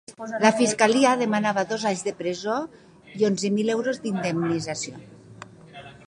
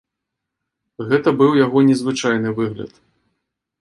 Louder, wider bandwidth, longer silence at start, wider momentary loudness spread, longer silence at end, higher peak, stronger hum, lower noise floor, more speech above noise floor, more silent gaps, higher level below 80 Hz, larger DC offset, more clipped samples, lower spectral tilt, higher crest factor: second, -23 LUFS vs -17 LUFS; about the same, 11 kHz vs 11.5 kHz; second, 0.1 s vs 1 s; about the same, 19 LU vs 17 LU; second, 0.15 s vs 0.95 s; about the same, -2 dBFS vs -2 dBFS; neither; second, -45 dBFS vs -81 dBFS; second, 22 dB vs 64 dB; neither; second, -66 dBFS vs -60 dBFS; neither; neither; second, -4.5 dB/octave vs -6 dB/octave; about the same, 22 dB vs 18 dB